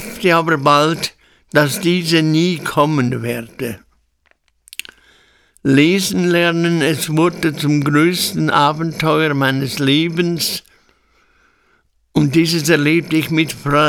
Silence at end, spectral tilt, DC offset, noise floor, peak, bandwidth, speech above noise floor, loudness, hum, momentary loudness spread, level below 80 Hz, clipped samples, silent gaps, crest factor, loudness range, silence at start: 0 s; -5 dB/octave; under 0.1%; -60 dBFS; 0 dBFS; 19.5 kHz; 45 dB; -15 LUFS; none; 11 LU; -50 dBFS; under 0.1%; none; 16 dB; 5 LU; 0 s